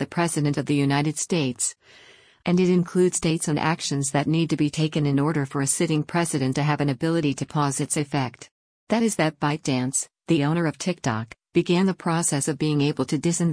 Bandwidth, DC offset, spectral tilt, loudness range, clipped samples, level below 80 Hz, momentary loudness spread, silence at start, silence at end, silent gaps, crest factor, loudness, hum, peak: 10.5 kHz; under 0.1%; -5 dB/octave; 2 LU; under 0.1%; -58 dBFS; 5 LU; 0 s; 0 s; 8.51-8.87 s; 14 dB; -23 LUFS; none; -8 dBFS